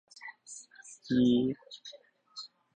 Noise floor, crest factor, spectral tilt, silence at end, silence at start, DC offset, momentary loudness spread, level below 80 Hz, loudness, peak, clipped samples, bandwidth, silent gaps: -55 dBFS; 18 dB; -5.5 dB/octave; 0.3 s; 0.25 s; under 0.1%; 23 LU; -66 dBFS; -29 LUFS; -16 dBFS; under 0.1%; 9.4 kHz; none